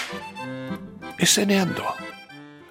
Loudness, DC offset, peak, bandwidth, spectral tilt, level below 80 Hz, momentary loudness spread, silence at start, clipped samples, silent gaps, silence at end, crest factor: -23 LUFS; under 0.1%; -4 dBFS; 16.5 kHz; -3 dB/octave; -62 dBFS; 22 LU; 0 s; under 0.1%; none; 0 s; 22 dB